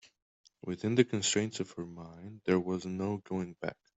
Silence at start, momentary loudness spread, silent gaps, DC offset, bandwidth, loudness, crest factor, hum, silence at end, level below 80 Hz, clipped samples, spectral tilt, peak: 0.65 s; 16 LU; none; under 0.1%; 8.2 kHz; -33 LUFS; 24 dB; none; 0.25 s; -70 dBFS; under 0.1%; -4.5 dB/octave; -12 dBFS